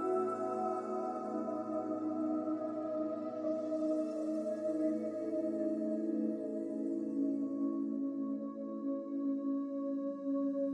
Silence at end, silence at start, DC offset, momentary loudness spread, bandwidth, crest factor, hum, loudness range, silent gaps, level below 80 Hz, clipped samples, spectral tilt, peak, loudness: 0 s; 0 s; under 0.1%; 4 LU; 9.6 kHz; 12 dB; none; 1 LU; none; -86 dBFS; under 0.1%; -8.5 dB/octave; -24 dBFS; -37 LUFS